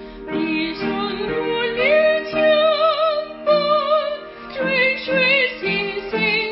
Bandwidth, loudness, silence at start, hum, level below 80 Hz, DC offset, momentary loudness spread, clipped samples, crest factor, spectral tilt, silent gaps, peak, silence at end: 5.8 kHz; -18 LUFS; 0 s; none; -50 dBFS; under 0.1%; 8 LU; under 0.1%; 14 dB; -8.5 dB/octave; none; -6 dBFS; 0 s